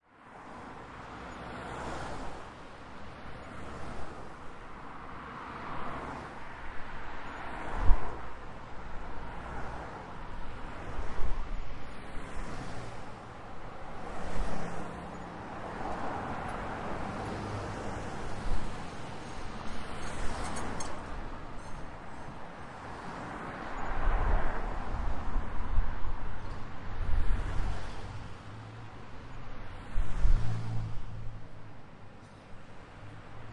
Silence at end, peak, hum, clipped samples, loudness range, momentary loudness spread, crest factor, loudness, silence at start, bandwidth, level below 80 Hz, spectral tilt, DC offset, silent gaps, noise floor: 0 s; -6 dBFS; none; under 0.1%; 6 LU; 11 LU; 24 dB; -40 LUFS; 0.25 s; 10.5 kHz; -38 dBFS; -6 dB/octave; under 0.1%; none; -51 dBFS